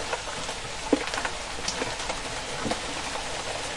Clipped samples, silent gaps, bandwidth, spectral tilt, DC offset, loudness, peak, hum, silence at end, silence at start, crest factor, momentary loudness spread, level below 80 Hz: under 0.1%; none; 11.5 kHz; -2.5 dB/octave; under 0.1%; -30 LUFS; -6 dBFS; none; 0 s; 0 s; 24 dB; 5 LU; -46 dBFS